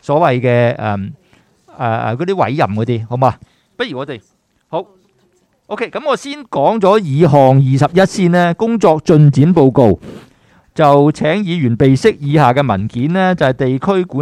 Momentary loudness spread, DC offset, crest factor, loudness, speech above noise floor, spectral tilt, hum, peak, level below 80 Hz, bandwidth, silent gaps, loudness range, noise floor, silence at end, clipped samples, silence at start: 14 LU; under 0.1%; 12 dB; -13 LUFS; 45 dB; -7.5 dB/octave; none; 0 dBFS; -46 dBFS; 10.5 kHz; none; 10 LU; -57 dBFS; 0 s; under 0.1%; 0.1 s